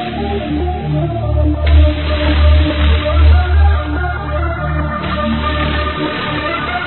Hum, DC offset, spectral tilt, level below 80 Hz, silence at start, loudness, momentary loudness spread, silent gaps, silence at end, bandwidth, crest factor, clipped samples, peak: none; 0.6%; -10.5 dB/octave; -16 dBFS; 0 s; -15 LUFS; 7 LU; none; 0 s; 4.3 kHz; 12 dB; under 0.1%; 0 dBFS